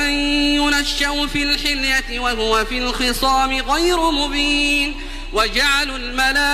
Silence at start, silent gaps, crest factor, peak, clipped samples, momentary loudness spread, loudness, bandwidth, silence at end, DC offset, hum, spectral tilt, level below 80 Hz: 0 s; none; 14 dB; -4 dBFS; under 0.1%; 4 LU; -17 LUFS; 15.5 kHz; 0 s; under 0.1%; none; -2 dB/octave; -28 dBFS